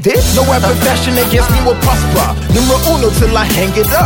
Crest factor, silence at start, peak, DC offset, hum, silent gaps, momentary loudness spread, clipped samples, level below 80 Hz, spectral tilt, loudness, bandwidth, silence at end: 10 dB; 0 s; 0 dBFS; under 0.1%; none; none; 2 LU; under 0.1%; -18 dBFS; -4.5 dB/octave; -11 LUFS; 17 kHz; 0 s